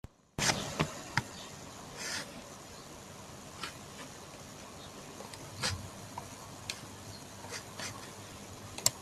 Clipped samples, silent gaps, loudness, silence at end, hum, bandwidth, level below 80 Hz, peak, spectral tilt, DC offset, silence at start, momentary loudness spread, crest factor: under 0.1%; none; -39 LUFS; 0 s; none; 15.5 kHz; -62 dBFS; -6 dBFS; -2.5 dB/octave; under 0.1%; 0.05 s; 16 LU; 34 dB